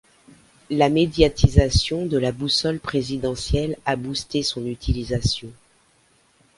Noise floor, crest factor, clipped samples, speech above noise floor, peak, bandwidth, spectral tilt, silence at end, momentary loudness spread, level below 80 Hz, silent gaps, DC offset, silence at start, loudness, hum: -60 dBFS; 22 dB; under 0.1%; 39 dB; 0 dBFS; 11.5 kHz; -5.5 dB/octave; 1.05 s; 8 LU; -32 dBFS; none; under 0.1%; 0.7 s; -22 LUFS; none